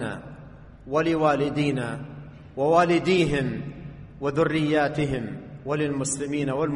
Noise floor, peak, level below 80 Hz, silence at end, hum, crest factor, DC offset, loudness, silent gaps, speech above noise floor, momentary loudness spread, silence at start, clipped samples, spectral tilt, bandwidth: -45 dBFS; -6 dBFS; -48 dBFS; 0 s; none; 18 dB; under 0.1%; -24 LUFS; none; 21 dB; 18 LU; 0 s; under 0.1%; -5.5 dB/octave; 11 kHz